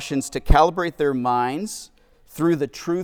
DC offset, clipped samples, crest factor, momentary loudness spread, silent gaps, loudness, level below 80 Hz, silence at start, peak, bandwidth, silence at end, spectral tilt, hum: under 0.1%; under 0.1%; 22 dB; 13 LU; none; -22 LUFS; -28 dBFS; 0 s; 0 dBFS; 18.5 kHz; 0 s; -5.5 dB/octave; none